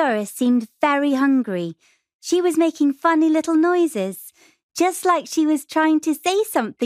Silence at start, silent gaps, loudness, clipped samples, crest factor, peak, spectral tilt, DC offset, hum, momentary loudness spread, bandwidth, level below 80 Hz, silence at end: 0 s; 2.14-2.19 s, 4.63-4.69 s; -19 LUFS; under 0.1%; 16 dB; -4 dBFS; -4 dB/octave; under 0.1%; none; 9 LU; 15.5 kHz; -74 dBFS; 0 s